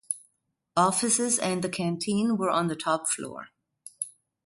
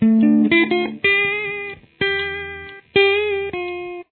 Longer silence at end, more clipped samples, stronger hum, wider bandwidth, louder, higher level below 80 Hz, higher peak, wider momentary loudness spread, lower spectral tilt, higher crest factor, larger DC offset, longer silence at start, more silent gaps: first, 0.35 s vs 0.1 s; neither; neither; first, 12 kHz vs 4.3 kHz; second, -27 LUFS vs -18 LUFS; second, -70 dBFS vs -52 dBFS; second, -10 dBFS vs -2 dBFS; about the same, 13 LU vs 14 LU; second, -3.5 dB/octave vs -8.5 dB/octave; about the same, 20 dB vs 16 dB; neither; about the same, 0.1 s vs 0 s; neither